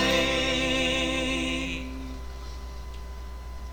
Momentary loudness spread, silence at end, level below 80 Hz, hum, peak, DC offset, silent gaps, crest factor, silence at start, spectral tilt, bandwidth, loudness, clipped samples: 17 LU; 0 s; -38 dBFS; none; -12 dBFS; 0.3%; none; 18 dB; 0 s; -3.5 dB/octave; 19.5 kHz; -26 LUFS; under 0.1%